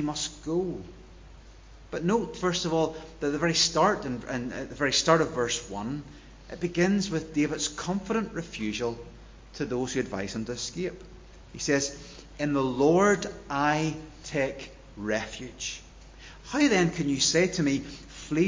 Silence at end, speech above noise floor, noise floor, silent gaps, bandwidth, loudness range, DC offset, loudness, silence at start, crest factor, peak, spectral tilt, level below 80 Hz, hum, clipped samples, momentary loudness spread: 0 s; 22 dB; -49 dBFS; none; 7.6 kHz; 6 LU; under 0.1%; -28 LUFS; 0 s; 22 dB; -6 dBFS; -4 dB/octave; -50 dBFS; none; under 0.1%; 19 LU